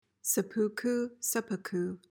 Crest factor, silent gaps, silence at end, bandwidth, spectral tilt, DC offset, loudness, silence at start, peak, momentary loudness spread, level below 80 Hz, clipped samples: 16 dB; none; 0.15 s; 18 kHz; -4 dB/octave; under 0.1%; -32 LUFS; 0.25 s; -18 dBFS; 5 LU; -80 dBFS; under 0.1%